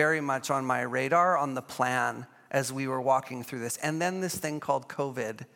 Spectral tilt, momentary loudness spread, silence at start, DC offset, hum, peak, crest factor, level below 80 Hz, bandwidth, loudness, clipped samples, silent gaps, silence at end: -4.5 dB/octave; 9 LU; 0 s; under 0.1%; none; -10 dBFS; 20 dB; -76 dBFS; 17 kHz; -29 LUFS; under 0.1%; none; 0.1 s